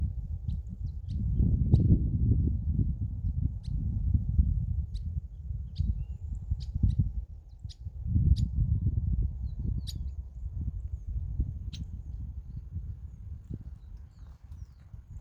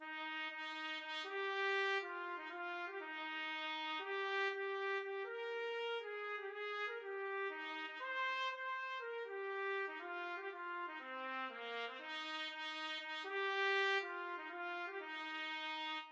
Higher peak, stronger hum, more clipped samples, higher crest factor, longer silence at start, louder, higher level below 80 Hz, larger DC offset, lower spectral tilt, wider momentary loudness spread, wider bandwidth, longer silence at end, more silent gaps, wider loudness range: first, -8 dBFS vs -28 dBFS; neither; neither; first, 22 dB vs 16 dB; about the same, 0 s vs 0 s; first, -32 LUFS vs -42 LUFS; first, -34 dBFS vs under -90 dBFS; neither; first, -9.5 dB/octave vs 0 dB/octave; first, 19 LU vs 8 LU; second, 7.2 kHz vs 8 kHz; about the same, 0 s vs 0 s; neither; first, 11 LU vs 4 LU